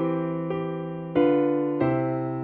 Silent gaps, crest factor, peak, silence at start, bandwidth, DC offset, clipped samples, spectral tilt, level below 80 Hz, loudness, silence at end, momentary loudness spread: none; 14 dB; -10 dBFS; 0 s; 4.5 kHz; under 0.1%; under 0.1%; -11.5 dB/octave; -60 dBFS; -25 LUFS; 0 s; 8 LU